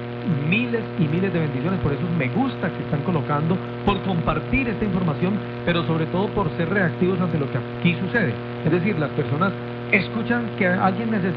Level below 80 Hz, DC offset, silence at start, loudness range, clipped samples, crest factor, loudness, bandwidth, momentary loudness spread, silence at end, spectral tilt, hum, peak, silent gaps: -44 dBFS; under 0.1%; 0 s; 1 LU; under 0.1%; 16 dB; -22 LUFS; 5.2 kHz; 4 LU; 0 s; -10 dB/octave; 60 Hz at -30 dBFS; -6 dBFS; none